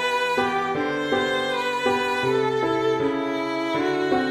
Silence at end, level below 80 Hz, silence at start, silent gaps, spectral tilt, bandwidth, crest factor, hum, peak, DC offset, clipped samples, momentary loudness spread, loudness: 0 s; -58 dBFS; 0 s; none; -4.5 dB/octave; 15 kHz; 14 dB; none; -8 dBFS; under 0.1%; under 0.1%; 3 LU; -23 LUFS